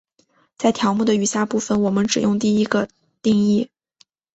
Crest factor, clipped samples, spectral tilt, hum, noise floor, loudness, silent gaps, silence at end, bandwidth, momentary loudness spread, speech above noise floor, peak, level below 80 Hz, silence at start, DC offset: 16 dB; under 0.1%; -5 dB/octave; none; -61 dBFS; -19 LUFS; none; 0.7 s; 8.2 kHz; 5 LU; 43 dB; -4 dBFS; -58 dBFS; 0.6 s; under 0.1%